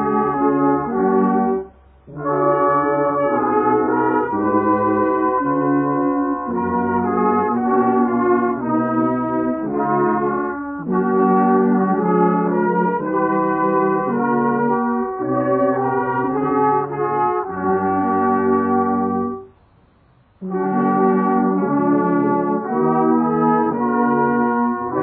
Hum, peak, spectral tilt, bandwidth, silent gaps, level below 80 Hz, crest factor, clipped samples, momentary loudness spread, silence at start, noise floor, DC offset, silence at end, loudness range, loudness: none; -4 dBFS; -12.5 dB/octave; 3.2 kHz; none; -54 dBFS; 14 dB; under 0.1%; 5 LU; 0 s; -54 dBFS; under 0.1%; 0 s; 2 LU; -18 LUFS